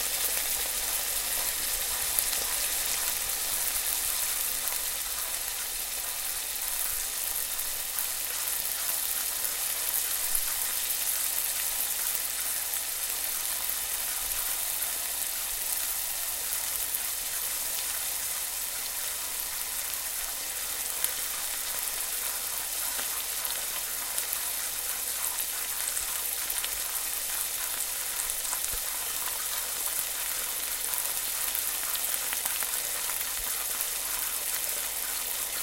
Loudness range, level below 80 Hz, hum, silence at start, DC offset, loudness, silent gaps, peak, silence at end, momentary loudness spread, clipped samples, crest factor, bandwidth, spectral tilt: 3 LU; -54 dBFS; none; 0 s; under 0.1%; -28 LUFS; none; -2 dBFS; 0 s; 3 LU; under 0.1%; 30 dB; 17 kHz; 2 dB/octave